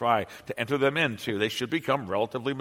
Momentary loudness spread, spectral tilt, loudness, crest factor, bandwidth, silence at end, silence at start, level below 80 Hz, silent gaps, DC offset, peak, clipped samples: 5 LU; -5 dB/octave; -28 LUFS; 18 dB; 16.5 kHz; 0 s; 0 s; -66 dBFS; none; under 0.1%; -8 dBFS; under 0.1%